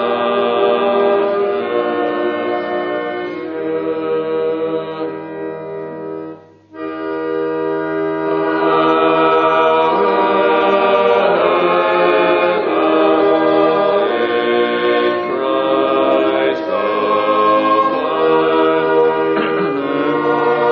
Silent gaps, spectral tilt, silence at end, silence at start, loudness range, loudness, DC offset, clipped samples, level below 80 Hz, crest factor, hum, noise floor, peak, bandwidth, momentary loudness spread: none; -3 dB/octave; 0 s; 0 s; 9 LU; -15 LUFS; under 0.1%; under 0.1%; -60 dBFS; 14 dB; none; -36 dBFS; 0 dBFS; 5.8 kHz; 10 LU